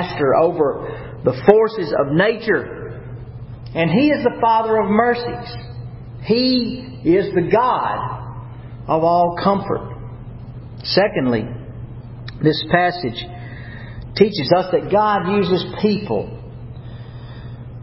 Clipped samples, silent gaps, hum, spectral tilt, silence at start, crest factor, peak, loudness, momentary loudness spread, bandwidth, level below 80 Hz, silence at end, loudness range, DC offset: under 0.1%; none; none; -10 dB/octave; 0 s; 18 dB; 0 dBFS; -18 LUFS; 19 LU; 5.8 kHz; -42 dBFS; 0 s; 3 LU; under 0.1%